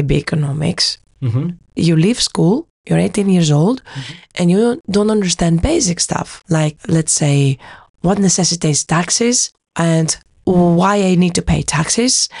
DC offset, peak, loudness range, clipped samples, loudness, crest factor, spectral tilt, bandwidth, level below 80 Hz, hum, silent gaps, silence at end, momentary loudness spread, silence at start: under 0.1%; -4 dBFS; 2 LU; under 0.1%; -15 LUFS; 12 dB; -4.5 dB/octave; 11.5 kHz; -36 dBFS; none; 2.70-2.84 s, 7.90-7.94 s; 0 s; 8 LU; 0 s